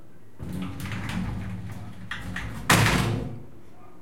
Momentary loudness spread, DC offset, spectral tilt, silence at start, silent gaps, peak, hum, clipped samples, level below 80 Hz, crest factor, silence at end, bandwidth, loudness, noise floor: 19 LU; 1%; -4 dB/octave; 0.05 s; none; -4 dBFS; none; under 0.1%; -42 dBFS; 24 dB; 0.05 s; 16.5 kHz; -27 LUFS; -50 dBFS